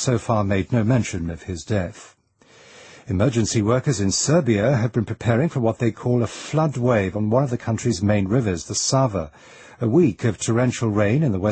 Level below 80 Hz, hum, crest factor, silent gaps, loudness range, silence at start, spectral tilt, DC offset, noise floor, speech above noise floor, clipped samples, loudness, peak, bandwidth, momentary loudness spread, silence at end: -48 dBFS; none; 16 dB; none; 4 LU; 0 s; -5.5 dB/octave; under 0.1%; -53 dBFS; 33 dB; under 0.1%; -21 LUFS; -4 dBFS; 8.8 kHz; 7 LU; 0 s